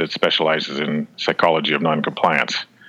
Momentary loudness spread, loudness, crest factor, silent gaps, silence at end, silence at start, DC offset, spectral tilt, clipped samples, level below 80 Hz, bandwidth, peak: 6 LU; -19 LUFS; 18 dB; none; 0.25 s; 0 s; under 0.1%; -4.5 dB/octave; under 0.1%; -62 dBFS; 11 kHz; -2 dBFS